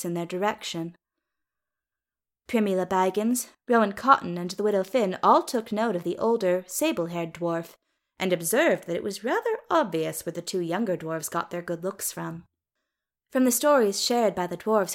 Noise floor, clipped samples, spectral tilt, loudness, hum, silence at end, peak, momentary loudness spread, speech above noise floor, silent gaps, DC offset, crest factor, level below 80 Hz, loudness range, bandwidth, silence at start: under -90 dBFS; under 0.1%; -4 dB/octave; -26 LUFS; none; 0 s; -4 dBFS; 11 LU; over 65 dB; none; under 0.1%; 22 dB; -70 dBFS; 6 LU; 17 kHz; 0 s